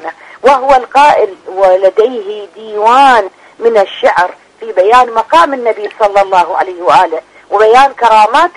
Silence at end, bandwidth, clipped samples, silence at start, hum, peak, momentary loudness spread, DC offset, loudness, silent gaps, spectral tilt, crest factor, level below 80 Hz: 0.05 s; 11 kHz; 1%; 0 s; none; 0 dBFS; 11 LU; under 0.1%; -9 LUFS; none; -3 dB/octave; 8 dB; -46 dBFS